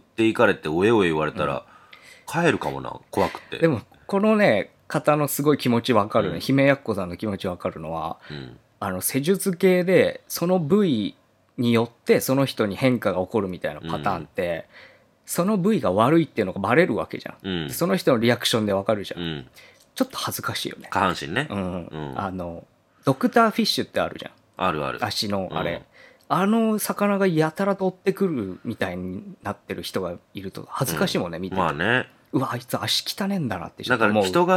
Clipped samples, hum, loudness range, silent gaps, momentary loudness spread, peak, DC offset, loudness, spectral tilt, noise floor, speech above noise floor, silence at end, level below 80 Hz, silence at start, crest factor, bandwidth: under 0.1%; none; 5 LU; none; 13 LU; -2 dBFS; under 0.1%; -23 LUFS; -5 dB/octave; -49 dBFS; 26 dB; 0 s; -60 dBFS; 0.2 s; 22 dB; 17.5 kHz